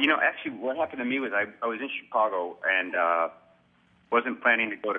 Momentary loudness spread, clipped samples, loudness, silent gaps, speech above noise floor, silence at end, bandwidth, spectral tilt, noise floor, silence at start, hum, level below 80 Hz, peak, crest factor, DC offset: 8 LU; under 0.1%; -27 LUFS; none; 36 dB; 0 s; 6.2 kHz; -6 dB/octave; -63 dBFS; 0 s; none; -76 dBFS; -8 dBFS; 20 dB; under 0.1%